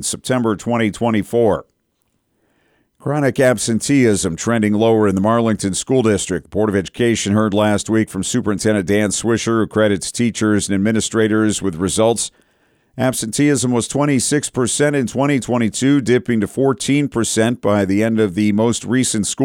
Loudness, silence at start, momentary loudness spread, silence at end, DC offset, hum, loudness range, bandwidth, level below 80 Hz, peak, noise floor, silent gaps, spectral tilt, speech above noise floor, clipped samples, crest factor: -17 LUFS; 0 s; 4 LU; 0 s; under 0.1%; none; 2 LU; 17 kHz; -48 dBFS; -4 dBFS; -67 dBFS; none; -5 dB/octave; 50 dB; under 0.1%; 14 dB